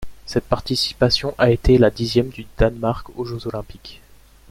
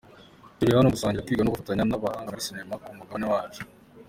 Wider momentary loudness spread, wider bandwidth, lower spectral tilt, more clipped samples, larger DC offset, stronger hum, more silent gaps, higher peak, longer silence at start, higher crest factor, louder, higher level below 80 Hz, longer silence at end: second, 14 LU vs 17 LU; about the same, 15.5 kHz vs 16.5 kHz; about the same, -6 dB/octave vs -6 dB/octave; neither; neither; neither; neither; first, 0 dBFS vs -8 dBFS; second, 0 s vs 0.15 s; about the same, 20 dB vs 18 dB; first, -20 LUFS vs -26 LUFS; first, -32 dBFS vs -50 dBFS; first, 0.55 s vs 0.05 s